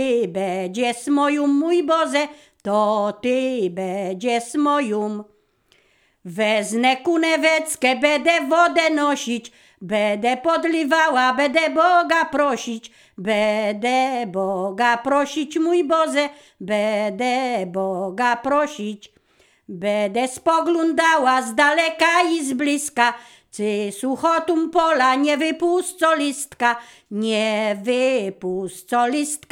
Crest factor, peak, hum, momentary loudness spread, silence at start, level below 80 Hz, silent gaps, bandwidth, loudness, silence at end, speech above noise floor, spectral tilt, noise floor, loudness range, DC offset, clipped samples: 18 dB; -2 dBFS; none; 10 LU; 0 s; -66 dBFS; none; 17 kHz; -20 LUFS; 0.15 s; 41 dB; -3.5 dB/octave; -60 dBFS; 4 LU; under 0.1%; under 0.1%